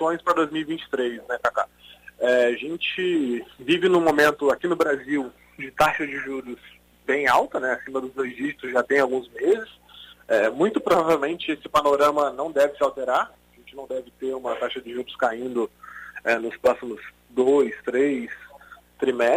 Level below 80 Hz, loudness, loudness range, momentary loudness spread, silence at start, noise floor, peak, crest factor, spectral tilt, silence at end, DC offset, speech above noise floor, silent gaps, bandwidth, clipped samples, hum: -58 dBFS; -23 LUFS; 5 LU; 14 LU; 0 s; -49 dBFS; -8 dBFS; 16 dB; -4.5 dB/octave; 0 s; under 0.1%; 26 dB; none; 16 kHz; under 0.1%; 60 Hz at -60 dBFS